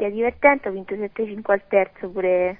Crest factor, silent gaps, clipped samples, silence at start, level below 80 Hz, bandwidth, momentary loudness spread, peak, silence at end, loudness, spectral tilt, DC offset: 20 dB; none; under 0.1%; 0 s; -54 dBFS; 3.6 kHz; 11 LU; 0 dBFS; 0.05 s; -22 LUFS; -10 dB/octave; 0.2%